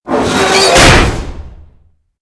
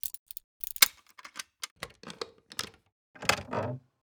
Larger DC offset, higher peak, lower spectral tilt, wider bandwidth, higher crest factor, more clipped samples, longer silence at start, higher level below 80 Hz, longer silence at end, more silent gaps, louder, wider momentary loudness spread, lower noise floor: neither; first, 0 dBFS vs -4 dBFS; first, -3.5 dB/octave vs -1 dB/octave; second, 11 kHz vs over 20 kHz; second, 10 dB vs 32 dB; first, 0.7% vs under 0.1%; about the same, 0.05 s vs 0.05 s; first, -20 dBFS vs -64 dBFS; first, 0.65 s vs 0.3 s; second, none vs 0.19-0.26 s, 0.44-0.60 s, 1.71-1.76 s, 2.92-3.14 s; first, -7 LUFS vs -30 LUFS; second, 17 LU vs 21 LU; second, -48 dBFS vs -52 dBFS